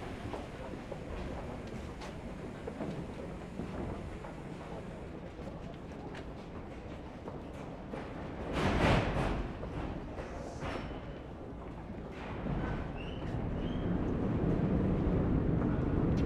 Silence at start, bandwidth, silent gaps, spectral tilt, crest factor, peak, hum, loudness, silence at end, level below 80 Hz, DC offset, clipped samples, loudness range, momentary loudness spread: 0 s; 12 kHz; none; -7.5 dB/octave; 20 dB; -16 dBFS; none; -38 LUFS; 0 s; -44 dBFS; under 0.1%; under 0.1%; 11 LU; 14 LU